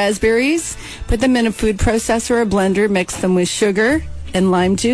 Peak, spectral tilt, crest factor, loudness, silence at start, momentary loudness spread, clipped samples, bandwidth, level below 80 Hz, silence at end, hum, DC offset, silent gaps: -4 dBFS; -5 dB/octave; 12 dB; -16 LUFS; 0 s; 6 LU; under 0.1%; 11 kHz; -30 dBFS; 0 s; none; under 0.1%; none